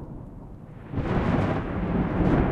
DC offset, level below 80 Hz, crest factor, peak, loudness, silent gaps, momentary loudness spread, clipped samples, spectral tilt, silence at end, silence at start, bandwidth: under 0.1%; -34 dBFS; 16 dB; -10 dBFS; -26 LUFS; none; 20 LU; under 0.1%; -9.5 dB/octave; 0 s; 0 s; 7.6 kHz